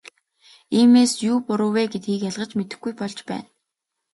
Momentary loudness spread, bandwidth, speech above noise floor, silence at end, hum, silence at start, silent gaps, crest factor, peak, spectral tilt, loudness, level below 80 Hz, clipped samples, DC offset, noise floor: 16 LU; 11.5 kHz; 61 dB; 0.7 s; none; 0.7 s; none; 16 dB; -6 dBFS; -5 dB/octave; -21 LUFS; -68 dBFS; under 0.1%; under 0.1%; -81 dBFS